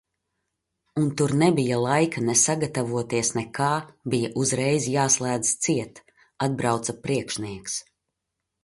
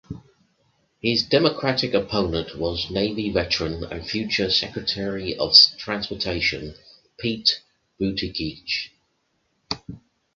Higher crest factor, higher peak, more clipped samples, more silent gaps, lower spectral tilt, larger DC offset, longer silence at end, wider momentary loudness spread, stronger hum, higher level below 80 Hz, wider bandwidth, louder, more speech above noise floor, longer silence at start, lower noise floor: second, 18 dB vs 24 dB; second, -6 dBFS vs 0 dBFS; neither; neither; about the same, -4 dB/octave vs -4.5 dB/octave; neither; first, 0.85 s vs 0.4 s; second, 10 LU vs 14 LU; neither; second, -60 dBFS vs -46 dBFS; first, 11.5 kHz vs 7.4 kHz; about the same, -24 LUFS vs -22 LUFS; first, 58 dB vs 47 dB; first, 0.95 s vs 0.1 s; first, -82 dBFS vs -70 dBFS